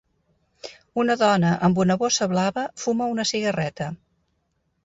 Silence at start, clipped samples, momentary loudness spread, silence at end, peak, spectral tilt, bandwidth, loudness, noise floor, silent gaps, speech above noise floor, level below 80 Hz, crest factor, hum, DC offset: 0.65 s; under 0.1%; 17 LU; 0.9 s; -8 dBFS; -5 dB/octave; 8 kHz; -22 LUFS; -72 dBFS; none; 50 dB; -58 dBFS; 16 dB; none; under 0.1%